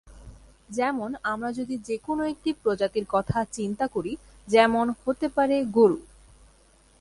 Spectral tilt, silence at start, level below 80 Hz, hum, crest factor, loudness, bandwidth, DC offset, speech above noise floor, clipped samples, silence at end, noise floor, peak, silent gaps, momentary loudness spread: -5.5 dB/octave; 0.05 s; -54 dBFS; none; 20 dB; -26 LUFS; 11.5 kHz; under 0.1%; 33 dB; under 0.1%; 1 s; -58 dBFS; -6 dBFS; none; 11 LU